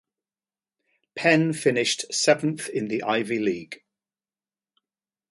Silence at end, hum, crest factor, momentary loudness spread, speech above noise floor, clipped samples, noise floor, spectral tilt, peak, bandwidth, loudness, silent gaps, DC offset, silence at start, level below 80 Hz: 1.55 s; none; 22 dB; 14 LU; over 66 dB; under 0.1%; under -90 dBFS; -4 dB/octave; -4 dBFS; 11.5 kHz; -23 LUFS; none; under 0.1%; 1.15 s; -70 dBFS